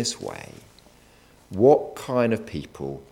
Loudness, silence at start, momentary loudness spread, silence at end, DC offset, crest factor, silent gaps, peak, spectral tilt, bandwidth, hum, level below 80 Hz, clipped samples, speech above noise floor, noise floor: -23 LUFS; 0 s; 19 LU; 0.1 s; under 0.1%; 22 dB; none; -4 dBFS; -5 dB/octave; 15.5 kHz; none; -56 dBFS; under 0.1%; 31 dB; -54 dBFS